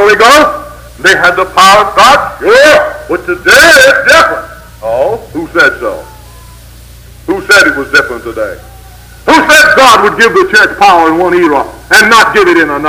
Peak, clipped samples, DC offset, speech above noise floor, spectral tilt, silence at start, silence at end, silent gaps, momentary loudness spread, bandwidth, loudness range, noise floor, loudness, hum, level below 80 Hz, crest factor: 0 dBFS; 6%; under 0.1%; 26 dB; -2.5 dB/octave; 0 s; 0 s; none; 15 LU; over 20 kHz; 7 LU; -31 dBFS; -5 LUFS; none; -34 dBFS; 6 dB